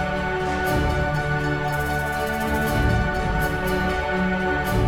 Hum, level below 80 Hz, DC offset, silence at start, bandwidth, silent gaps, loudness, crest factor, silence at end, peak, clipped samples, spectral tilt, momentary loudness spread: none; -30 dBFS; under 0.1%; 0 s; 19.5 kHz; none; -23 LUFS; 14 dB; 0 s; -8 dBFS; under 0.1%; -6 dB/octave; 3 LU